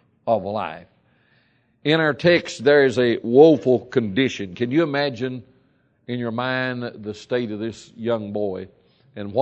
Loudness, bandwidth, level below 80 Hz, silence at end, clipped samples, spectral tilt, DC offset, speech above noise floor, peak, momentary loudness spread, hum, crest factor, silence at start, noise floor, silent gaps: -21 LUFS; 8.8 kHz; -64 dBFS; 0 s; under 0.1%; -6 dB/octave; under 0.1%; 42 dB; 0 dBFS; 16 LU; none; 20 dB; 0.25 s; -62 dBFS; none